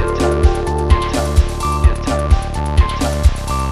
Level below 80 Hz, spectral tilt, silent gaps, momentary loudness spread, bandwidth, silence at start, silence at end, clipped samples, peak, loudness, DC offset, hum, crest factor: -16 dBFS; -6 dB/octave; none; 3 LU; 13.5 kHz; 0 s; 0 s; under 0.1%; 0 dBFS; -16 LUFS; under 0.1%; none; 14 dB